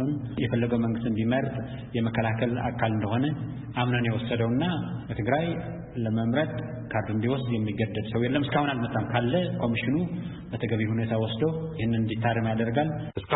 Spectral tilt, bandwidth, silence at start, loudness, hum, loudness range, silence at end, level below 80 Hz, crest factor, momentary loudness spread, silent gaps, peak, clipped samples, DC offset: -11.5 dB/octave; 4.1 kHz; 0 s; -28 LUFS; none; 1 LU; 0 s; -52 dBFS; 18 dB; 7 LU; none; -10 dBFS; under 0.1%; under 0.1%